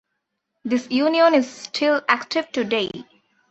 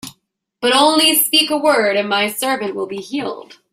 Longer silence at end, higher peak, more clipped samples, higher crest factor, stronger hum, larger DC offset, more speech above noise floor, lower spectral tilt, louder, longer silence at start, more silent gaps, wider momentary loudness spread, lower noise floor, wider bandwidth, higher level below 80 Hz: first, 0.5 s vs 0.3 s; about the same, -2 dBFS vs 0 dBFS; neither; about the same, 20 dB vs 16 dB; neither; neither; first, 57 dB vs 48 dB; first, -4 dB/octave vs -1.5 dB/octave; second, -20 LUFS vs -15 LUFS; first, 0.65 s vs 0.05 s; neither; about the same, 12 LU vs 14 LU; first, -77 dBFS vs -64 dBFS; second, 8.2 kHz vs 16 kHz; about the same, -66 dBFS vs -64 dBFS